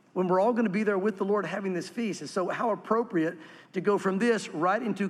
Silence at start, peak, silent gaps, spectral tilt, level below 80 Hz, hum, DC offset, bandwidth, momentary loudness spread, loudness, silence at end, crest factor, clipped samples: 0.15 s; -12 dBFS; none; -6 dB/octave; -82 dBFS; none; under 0.1%; 12.5 kHz; 8 LU; -28 LUFS; 0 s; 16 dB; under 0.1%